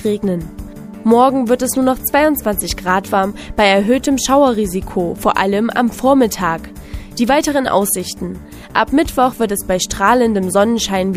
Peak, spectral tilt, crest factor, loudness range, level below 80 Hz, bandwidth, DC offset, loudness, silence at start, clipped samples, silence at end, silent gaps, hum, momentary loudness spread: 0 dBFS; -4 dB/octave; 16 dB; 2 LU; -36 dBFS; 15.5 kHz; under 0.1%; -15 LUFS; 0 s; under 0.1%; 0 s; none; none; 12 LU